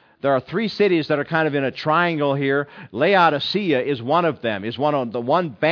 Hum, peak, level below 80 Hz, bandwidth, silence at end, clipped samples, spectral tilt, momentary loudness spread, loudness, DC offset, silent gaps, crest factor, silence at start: none; -4 dBFS; -66 dBFS; 5.4 kHz; 0 s; under 0.1%; -7.5 dB/octave; 6 LU; -20 LUFS; under 0.1%; none; 16 dB; 0.25 s